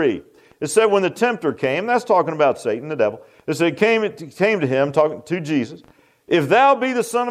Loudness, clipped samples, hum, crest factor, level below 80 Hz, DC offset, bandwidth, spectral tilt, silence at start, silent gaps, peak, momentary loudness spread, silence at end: -19 LUFS; under 0.1%; none; 16 dB; -66 dBFS; under 0.1%; 15 kHz; -5 dB/octave; 0 s; none; -2 dBFS; 10 LU; 0 s